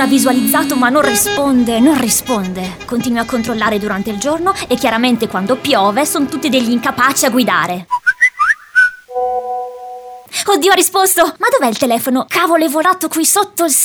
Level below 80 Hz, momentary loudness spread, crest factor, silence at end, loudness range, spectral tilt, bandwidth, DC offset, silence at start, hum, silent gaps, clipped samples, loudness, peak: -48 dBFS; 8 LU; 14 dB; 0 s; 3 LU; -2.5 dB/octave; over 20 kHz; under 0.1%; 0 s; none; none; under 0.1%; -13 LUFS; 0 dBFS